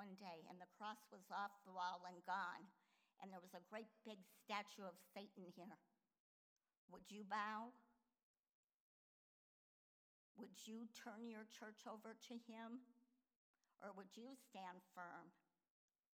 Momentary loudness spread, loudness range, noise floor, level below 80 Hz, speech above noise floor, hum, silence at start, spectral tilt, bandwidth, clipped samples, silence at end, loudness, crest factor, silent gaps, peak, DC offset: 12 LU; 8 LU; under -90 dBFS; under -90 dBFS; over 35 dB; none; 0 s; -4 dB/octave; over 20 kHz; under 0.1%; 0.85 s; -55 LUFS; 24 dB; 6.20-6.56 s, 6.77-6.88 s, 8.23-8.44 s, 8.51-10.35 s, 13.36-13.54 s; -32 dBFS; under 0.1%